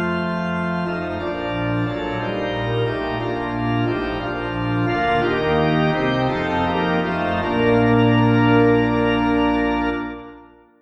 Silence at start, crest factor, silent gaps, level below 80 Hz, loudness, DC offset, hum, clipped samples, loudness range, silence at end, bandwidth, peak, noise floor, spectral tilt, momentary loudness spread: 0 s; 16 dB; none; -40 dBFS; -20 LUFS; under 0.1%; none; under 0.1%; 6 LU; 0.35 s; 7.4 kHz; -4 dBFS; -45 dBFS; -8 dB/octave; 9 LU